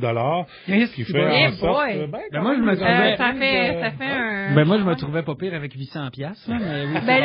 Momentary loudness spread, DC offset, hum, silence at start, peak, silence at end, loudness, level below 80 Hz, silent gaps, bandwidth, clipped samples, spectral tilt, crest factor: 12 LU; under 0.1%; none; 0 s; -2 dBFS; 0 s; -21 LUFS; -50 dBFS; none; 5.6 kHz; under 0.1%; -4 dB/octave; 18 dB